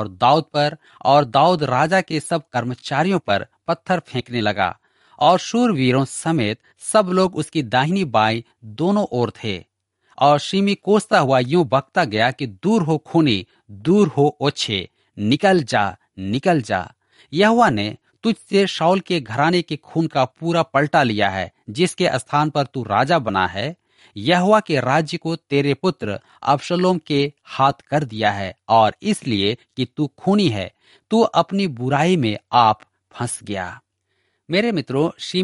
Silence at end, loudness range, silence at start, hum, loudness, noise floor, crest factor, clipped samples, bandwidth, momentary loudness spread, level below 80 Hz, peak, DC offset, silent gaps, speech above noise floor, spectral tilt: 0 s; 2 LU; 0 s; none; -19 LUFS; -70 dBFS; 18 dB; under 0.1%; 11.5 kHz; 10 LU; -58 dBFS; -2 dBFS; under 0.1%; none; 51 dB; -5.5 dB/octave